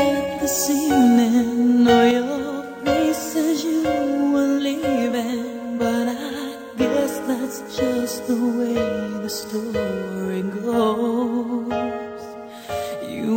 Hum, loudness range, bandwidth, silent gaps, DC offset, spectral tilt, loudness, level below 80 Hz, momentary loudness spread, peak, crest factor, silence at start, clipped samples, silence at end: none; 6 LU; 16.5 kHz; none; under 0.1%; -4.5 dB/octave; -21 LUFS; -52 dBFS; 12 LU; -2 dBFS; 18 dB; 0 s; under 0.1%; 0 s